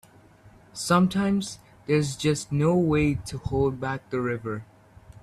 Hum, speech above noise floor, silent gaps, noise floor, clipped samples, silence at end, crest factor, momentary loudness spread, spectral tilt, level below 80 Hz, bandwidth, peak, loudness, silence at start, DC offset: none; 29 dB; none; -53 dBFS; under 0.1%; 0.6 s; 18 dB; 13 LU; -6 dB/octave; -48 dBFS; 13.5 kHz; -8 dBFS; -25 LUFS; 0.45 s; under 0.1%